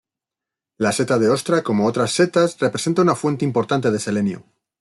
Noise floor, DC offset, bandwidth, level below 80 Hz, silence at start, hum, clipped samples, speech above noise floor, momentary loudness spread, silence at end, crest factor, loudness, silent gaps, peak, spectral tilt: -87 dBFS; under 0.1%; 12.5 kHz; -62 dBFS; 0.8 s; none; under 0.1%; 68 dB; 5 LU; 0.4 s; 16 dB; -19 LUFS; none; -4 dBFS; -5.5 dB/octave